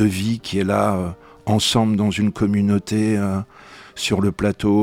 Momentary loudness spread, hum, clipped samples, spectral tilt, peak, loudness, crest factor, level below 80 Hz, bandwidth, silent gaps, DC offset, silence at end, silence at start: 10 LU; none; under 0.1%; -5.5 dB/octave; -4 dBFS; -20 LUFS; 16 dB; -46 dBFS; 16 kHz; none; under 0.1%; 0 s; 0 s